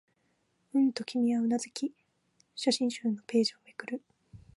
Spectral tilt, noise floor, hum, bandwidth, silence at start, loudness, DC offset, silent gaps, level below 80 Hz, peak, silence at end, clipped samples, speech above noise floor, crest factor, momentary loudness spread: -4 dB/octave; -74 dBFS; none; 11.5 kHz; 0.75 s; -31 LUFS; under 0.1%; none; -72 dBFS; -14 dBFS; 0.2 s; under 0.1%; 45 dB; 18 dB; 12 LU